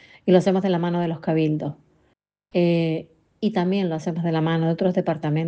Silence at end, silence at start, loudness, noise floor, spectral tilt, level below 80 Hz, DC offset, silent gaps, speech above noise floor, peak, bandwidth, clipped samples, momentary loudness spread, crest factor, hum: 0 s; 0.25 s; -22 LUFS; -67 dBFS; -8 dB/octave; -64 dBFS; under 0.1%; none; 46 dB; -4 dBFS; 8.4 kHz; under 0.1%; 8 LU; 18 dB; none